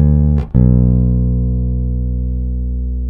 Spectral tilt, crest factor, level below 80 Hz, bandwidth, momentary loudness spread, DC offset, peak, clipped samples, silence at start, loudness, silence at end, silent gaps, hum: -13.5 dB/octave; 12 dB; -16 dBFS; 1.8 kHz; 9 LU; under 0.1%; -2 dBFS; under 0.1%; 0 s; -15 LUFS; 0 s; none; 60 Hz at -40 dBFS